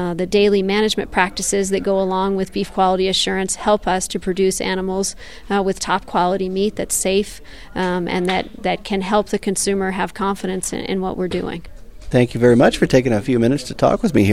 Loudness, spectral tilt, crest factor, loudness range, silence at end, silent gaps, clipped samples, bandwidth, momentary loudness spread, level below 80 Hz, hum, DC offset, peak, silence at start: -18 LUFS; -4.5 dB/octave; 18 dB; 3 LU; 0 s; none; under 0.1%; 14.5 kHz; 8 LU; -40 dBFS; none; 1%; 0 dBFS; 0 s